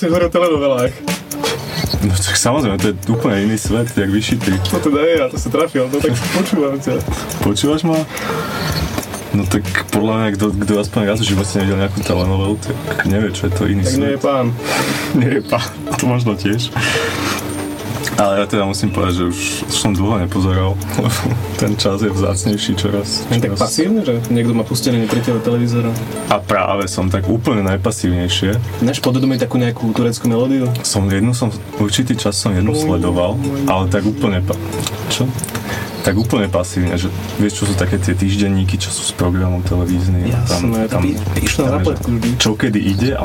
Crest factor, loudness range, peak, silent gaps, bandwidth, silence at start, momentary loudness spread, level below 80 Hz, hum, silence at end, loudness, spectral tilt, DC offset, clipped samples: 14 dB; 2 LU; 0 dBFS; none; 17 kHz; 0 s; 4 LU; -36 dBFS; none; 0 s; -16 LUFS; -5 dB/octave; under 0.1%; under 0.1%